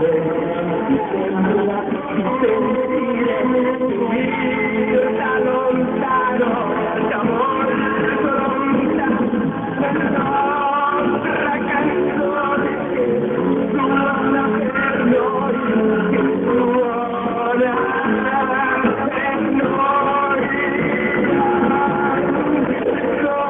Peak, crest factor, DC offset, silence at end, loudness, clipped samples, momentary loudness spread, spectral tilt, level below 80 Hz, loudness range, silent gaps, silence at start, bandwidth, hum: -4 dBFS; 14 dB; under 0.1%; 0 s; -18 LUFS; under 0.1%; 3 LU; -9.5 dB/octave; -48 dBFS; 1 LU; none; 0 s; 3.8 kHz; none